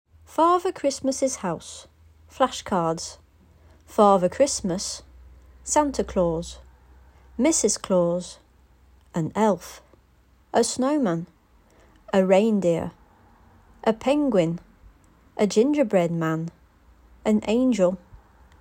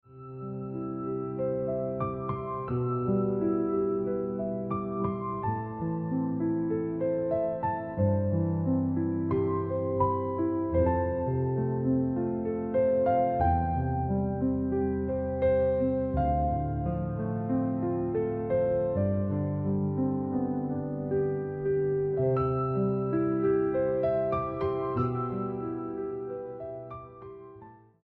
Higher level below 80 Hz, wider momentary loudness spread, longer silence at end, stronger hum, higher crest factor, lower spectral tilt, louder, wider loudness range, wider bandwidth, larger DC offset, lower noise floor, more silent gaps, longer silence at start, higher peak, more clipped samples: second, -52 dBFS vs -46 dBFS; first, 16 LU vs 8 LU; first, 0.45 s vs 0.3 s; neither; about the same, 20 dB vs 16 dB; second, -5 dB/octave vs -10.5 dB/octave; first, -23 LUFS vs -29 LUFS; about the same, 3 LU vs 3 LU; first, 16 kHz vs 4.3 kHz; neither; first, -58 dBFS vs -51 dBFS; neither; first, 0.3 s vs 0.1 s; first, -4 dBFS vs -14 dBFS; neither